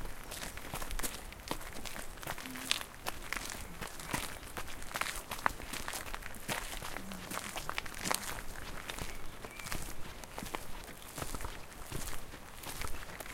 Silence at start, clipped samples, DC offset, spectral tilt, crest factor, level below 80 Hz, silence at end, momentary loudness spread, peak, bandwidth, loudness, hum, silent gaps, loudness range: 0 s; under 0.1%; under 0.1%; -2 dB/octave; 34 dB; -48 dBFS; 0 s; 10 LU; -6 dBFS; 17 kHz; -41 LUFS; none; none; 5 LU